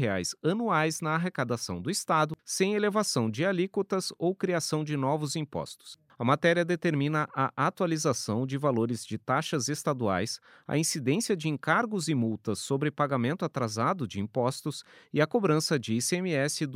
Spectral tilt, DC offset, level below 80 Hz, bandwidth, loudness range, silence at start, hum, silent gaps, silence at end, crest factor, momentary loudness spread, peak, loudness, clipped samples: -5 dB/octave; under 0.1%; -70 dBFS; 16 kHz; 2 LU; 0 s; none; none; 0 s; 20 dB; 6 LU; -10 dBFS; -29 LUFS; under 0.1%